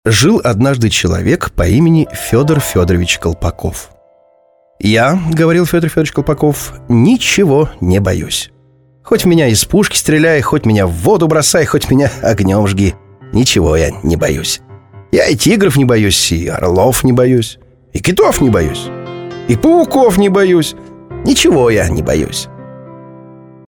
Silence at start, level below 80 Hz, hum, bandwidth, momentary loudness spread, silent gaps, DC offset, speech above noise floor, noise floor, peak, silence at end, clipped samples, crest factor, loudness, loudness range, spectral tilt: 0.05 s; -30 dBFS; none; 19 kHz; 9 LU; none; under 0.1%; 40 dB; -51 dBFS; 0 dBFS; 0.5 s; under 0.1%; 12 dB; -11 LUFS; 3 LU; -5 dB/octave